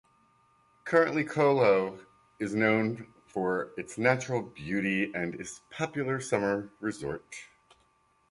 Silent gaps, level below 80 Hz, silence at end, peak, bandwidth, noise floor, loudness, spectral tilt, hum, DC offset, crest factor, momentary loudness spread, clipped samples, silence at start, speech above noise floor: none; -66 dBFS; 0.85 s; -8 dBFS; 11.5 kHz; -68 dBFS; -29 LUFS; -6 dB/octave; none; under 0.1%; 22 dB; 15 LU; under 0.1%; 0.85 s; 39 dB